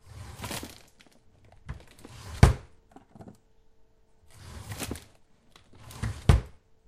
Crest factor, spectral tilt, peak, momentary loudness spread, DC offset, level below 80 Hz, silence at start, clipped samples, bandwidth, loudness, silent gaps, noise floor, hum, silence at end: 30 dB; -6 dB/octave; 0 dBFS; 28 LU; under 0.1%; -36 dBFS; 0.15 s; under 0.1%; 15.5 kHz; -28 LUFS; none; -60 dBFS; none; 0.4 s